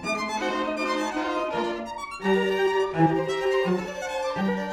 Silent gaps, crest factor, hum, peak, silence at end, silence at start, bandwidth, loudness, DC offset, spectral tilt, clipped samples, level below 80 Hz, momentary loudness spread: none; 16 dB; none; -10 dBFS; 0 s; 0 s; 14 kHz; -26 LUFS; under 0.1%; -5.5 dB/octave; under 0.1%; -56 dBFS; 7 LU